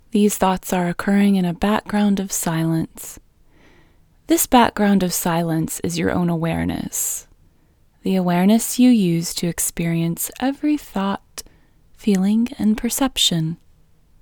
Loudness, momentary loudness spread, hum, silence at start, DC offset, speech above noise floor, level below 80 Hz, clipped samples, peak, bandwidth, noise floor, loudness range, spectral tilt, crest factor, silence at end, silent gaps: -19 LUFS; 9 LU; none; 0.15 s; under 0.1%; 37 dB; -46 dBFS; under 0.1%; 0 dBFS; over 20 kHz; -56 dBFS; 3 LU; -4.5 dB/octave; 20 dB; 0.65 s; none